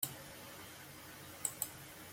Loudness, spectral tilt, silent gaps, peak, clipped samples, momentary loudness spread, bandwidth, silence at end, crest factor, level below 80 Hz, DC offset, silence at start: -45 LUFS; -1.5 dB/octave; none; -16 dBFS; under 0.1%; 12 LU; 16.5 kHz; 0 s; 32 dB; -74 dBFS; under 0.1%; 0 s